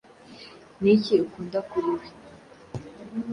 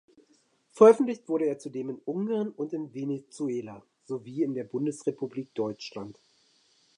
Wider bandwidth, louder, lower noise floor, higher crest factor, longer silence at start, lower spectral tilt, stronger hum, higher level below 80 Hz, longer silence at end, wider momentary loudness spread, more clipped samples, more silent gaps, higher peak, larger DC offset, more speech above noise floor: about the same, 10.5 kHz vs 10.5 kHz; first, -25 LUFS vs -28 LUFS; second, -49 dBFS vs -67 dBFS; about the same, 20 dB vs 24 dB; second, 0.3 s vs 0.75 s; about the same, -7.5 dB/octave vs -7 dB/octave; neither; first, -60 dBFS vs -80 dBFS; second, 0 s vs 0.85 s; first, 24 LU vs 19 LU; neither; neither; second, -8 dBFS vs -4 dBFS; neither; second, 25 dB vs 39 dB